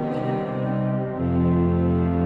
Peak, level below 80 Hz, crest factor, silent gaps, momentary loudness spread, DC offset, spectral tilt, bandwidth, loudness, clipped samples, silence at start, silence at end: -10 dBFS; -40 dBFS; 12 dB; none; 5 LU; under 0.1%; -11 dB/octave; 4.2 kHz; -23 LUFS; under 0.1%; 0 s; 0 s